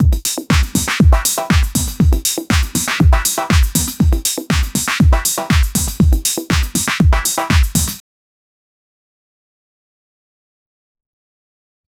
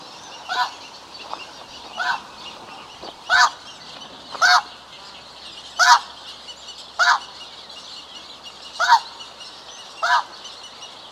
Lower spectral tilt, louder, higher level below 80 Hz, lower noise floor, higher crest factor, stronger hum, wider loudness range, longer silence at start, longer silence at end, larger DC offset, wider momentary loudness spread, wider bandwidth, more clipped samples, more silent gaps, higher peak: first, -4 dB/octave vs 1 dB/octave; first, -15 LUFS vs -19 LUFS; first, -18 dBFS vs -64 dBFS; first, under -90 dBFS vs -41 dBFS; second, 16 dB vs 24 dB; neither; about the same, 5 LU vs 5 LU; about the same, 0 s vs 0 s; first, 3.9 s vs 0 s; neither; second, 4 LU vs 21 LU; first, 19.5 kHz vs 16 kHz; neither; neither; about the same, 0 dBFS vs 0 dBFS